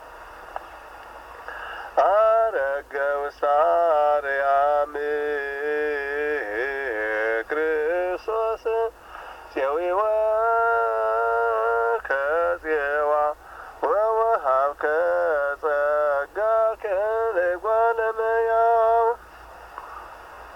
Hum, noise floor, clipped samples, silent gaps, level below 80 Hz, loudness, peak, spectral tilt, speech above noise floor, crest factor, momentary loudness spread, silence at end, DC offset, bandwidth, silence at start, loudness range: none; -44 dBFS; under 0.1%; none; -54 dBFS; -23 LUFS; -8 dBFS; -4.5 dB/octave; 22 dB; 14 dB; 18 LU; 0 s; under 0.1%; 16 kHz; 0 s; 3 LU